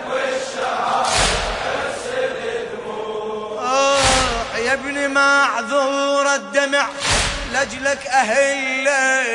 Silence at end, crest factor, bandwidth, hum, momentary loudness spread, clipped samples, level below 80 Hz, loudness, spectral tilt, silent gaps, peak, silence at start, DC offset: 0 s; 16 dB; 11 kHz; none; 10 LU; under 0.1%; -38 dBFS; -18 LUFS; -2 dB/octave; none; -2 dBFS; 0 s; under 0.1%